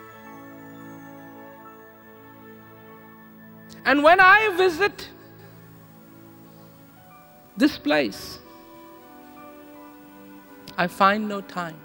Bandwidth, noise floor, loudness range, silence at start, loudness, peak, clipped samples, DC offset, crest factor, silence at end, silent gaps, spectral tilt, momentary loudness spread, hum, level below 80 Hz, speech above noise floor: 20 kHz; -49 dBFS; 12 LU; 0.25 s; -19 LUFS; -4 dBFS; under 0.1%; under 0.1%; 22 dB; 0.1 s; none; -4.5 dB/octave; 30 LU; none; -60 dBFS; 29 dB